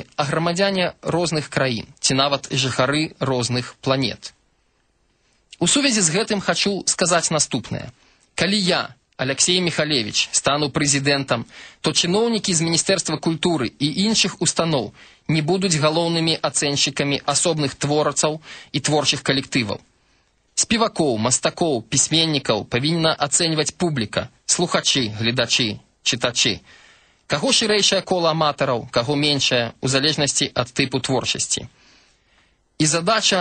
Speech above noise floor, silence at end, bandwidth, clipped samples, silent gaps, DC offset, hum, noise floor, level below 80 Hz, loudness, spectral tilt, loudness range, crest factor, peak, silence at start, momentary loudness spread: 44 dB; 0 s; 9.4 kHz; under 0.1%; none; under 0.1%; none; -64 dBFS; -54 dBFS; -19 LUFS; -3 dB/octave; 3 LU; 18 dB; -4 dBFS; 0 s; 7 LU